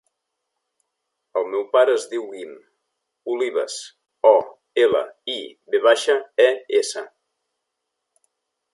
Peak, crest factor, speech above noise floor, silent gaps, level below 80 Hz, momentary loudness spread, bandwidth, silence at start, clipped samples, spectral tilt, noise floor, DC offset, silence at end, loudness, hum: -2 dBFS; 22 dB; 60 dB; none; -74 dBFS; 17 LU; 11.5 kHz; 1.35 s; under 0.1%; -2 dB/octave; -79 dBFS; under 0.1%; 1.65 s; -20 LUFS; none